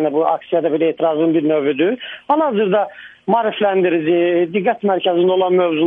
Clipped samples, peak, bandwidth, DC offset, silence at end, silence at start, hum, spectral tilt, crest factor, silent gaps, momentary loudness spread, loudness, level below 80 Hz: under 0.1%; -2 dBFS; 3.8 kHz; under 0.1%; 0 s; 0 s; none; -9 dB/octave; 14 dB; none; 4 LU; -17 LUFS; -68 dBFS